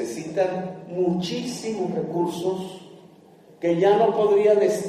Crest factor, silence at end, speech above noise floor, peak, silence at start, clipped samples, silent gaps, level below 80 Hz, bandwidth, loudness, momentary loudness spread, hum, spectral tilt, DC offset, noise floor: 16 dB; 0 s; 29 dB; -6 dBFS; 0 s; under 0.1%; none; -68 dBFS; 14 kHz; -23 LUFS; 13 LU; none; -6 dB/octave; under 0.1%; -50 dBFS